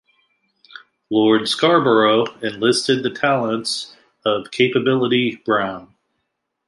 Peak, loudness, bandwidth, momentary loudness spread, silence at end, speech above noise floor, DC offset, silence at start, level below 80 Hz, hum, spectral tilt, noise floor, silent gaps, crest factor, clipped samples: -2 dBFS; -18 LUFS; 11.5 kHz; 10 LU; 0.8 s; 57 dB; under 0.1%; 1.1 s; -64 dBFS; none; -4.5 dB/octave; -75 dBFS; none; 18 dB; under 0.1%